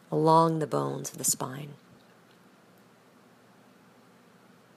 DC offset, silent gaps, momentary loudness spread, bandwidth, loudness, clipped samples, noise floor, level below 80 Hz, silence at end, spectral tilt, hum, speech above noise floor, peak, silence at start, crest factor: under 0.1%; none; 18 LU; 15.5 kHz; -26 LUFS; under 0.1%; -58 dBFS; -78 dBFS; 3 s; -5 dB/octave; none; 32 dB; -8 dBFS; 0.1 s; 22 dB